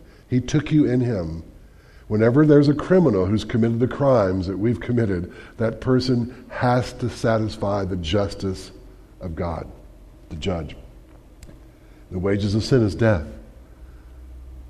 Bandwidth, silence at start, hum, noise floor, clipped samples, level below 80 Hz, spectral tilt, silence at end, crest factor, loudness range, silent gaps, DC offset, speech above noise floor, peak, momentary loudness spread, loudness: 11.5 kHz; 0.3 s; none; -47 dBFS; under 0.1%; -42 dBFS; -7.5 dB/octave; 0 s; 18 dB; 12 LU; none; under 0.1%; 26 dB; -4 dBFS; 17 LU; -21 LUFS